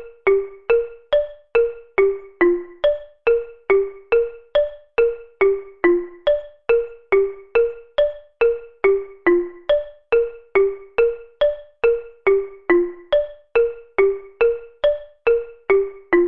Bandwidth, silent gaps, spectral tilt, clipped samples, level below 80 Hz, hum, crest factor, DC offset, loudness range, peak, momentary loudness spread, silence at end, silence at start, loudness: 4.3 kHz; none; -7.5 dB/octave; under 0.1%; -46 dBFS; none; 16 dB; 0.6%; 0 LU; -4 dBFS; 3 LU; 0 s; 0 s; -20 LUFS